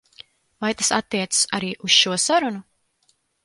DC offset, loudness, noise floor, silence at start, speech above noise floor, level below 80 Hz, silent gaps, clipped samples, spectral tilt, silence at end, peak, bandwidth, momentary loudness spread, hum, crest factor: under 0.1%; -20 LUFS; -66 dBFS; 0.6 s; 45 dB; -64 dBFS; none; under 0.1%; -1.5 dB/octave; 0.85 s; -2 dBFS; 12 kHz; 12 LU; none; 20 dB